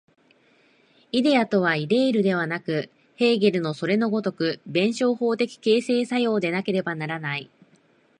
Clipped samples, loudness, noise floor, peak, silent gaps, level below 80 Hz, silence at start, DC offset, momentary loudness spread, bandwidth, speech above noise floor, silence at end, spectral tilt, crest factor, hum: under 0.1%; -23 LUFS; -60 dBFS; -6 dBFS; none; -72 dBFS; 1.15 s; under 0.1%; 8 LU; 10.5 kHz; 38 dB; 0.75 s; -6 dB/octave; 18 dB; none